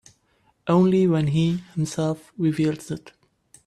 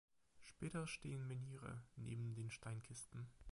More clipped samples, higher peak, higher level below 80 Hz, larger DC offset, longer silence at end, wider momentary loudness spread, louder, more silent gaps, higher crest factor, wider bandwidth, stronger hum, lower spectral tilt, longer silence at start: neither; first, -8 dBFS vs -34 dBFS; first, -58 dBFS vs -70 dBFS; neither; first, 0.55 s vs 0 s; first, 14 LU vs 7 LU; first, -22 LUFS vs -51 LUFS; neither; about the same, 14 dB vs 16 dB; about the same, 12.5 kHz vs 11.5 kHz; neither; first, -7.5 dB/octave vs -5.5 dB/octave; first, 0.65 s vs 0.35 s